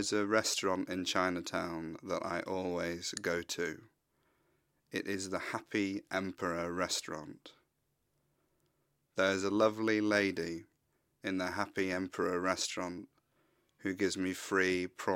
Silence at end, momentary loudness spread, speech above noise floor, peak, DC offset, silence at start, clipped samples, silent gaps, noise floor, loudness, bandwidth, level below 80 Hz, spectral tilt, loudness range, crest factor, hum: 0 s; 11 LU; 45 dB; -14 dBFS; under 0.1%; 0 s; under 0.1%; none; -80 dBFS; -35 LUFS; 16.5 kHz; -72 dBFS; -3.5 dB/octave; 5 LU; 22 dB; none